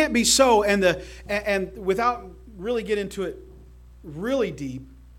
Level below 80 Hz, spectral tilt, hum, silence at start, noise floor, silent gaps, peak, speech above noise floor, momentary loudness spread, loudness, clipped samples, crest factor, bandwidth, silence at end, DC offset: -46 dBFS; -3 dB/octave; none; 0 s; -47 dBFS; none; -6 dBFS; 23 dB; 18 LU; -23 LUFS; under 0.1%; 18 dB; 17 kHz; 0 s; under 0.1%